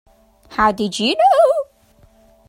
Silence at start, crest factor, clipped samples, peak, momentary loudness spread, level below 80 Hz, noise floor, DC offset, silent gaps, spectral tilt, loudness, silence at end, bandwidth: 0.5 s; 16 dB; under 0.1%; -2 dBFS; 13 LU; -48 dBFS; -52 dBFS; under 0.1%; none; -4 dB/octave; -16 LUFS; 0.85 s; 16.5 kHz